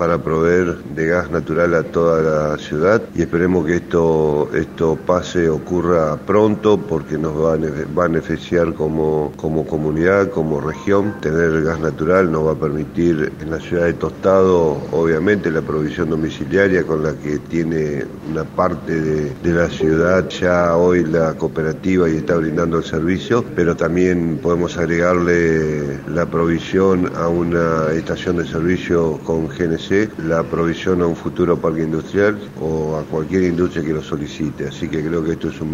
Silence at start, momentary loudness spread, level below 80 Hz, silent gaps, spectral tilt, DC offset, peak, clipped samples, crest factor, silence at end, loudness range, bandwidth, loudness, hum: 0 s; 6 LU; -40 dBFS; none; -7 dB/octave; under 0.1%; 0 dBFS; under 0.1%; 16 dB; 0 s; 3 LU; 11.5 kHz; -18 LUFS; none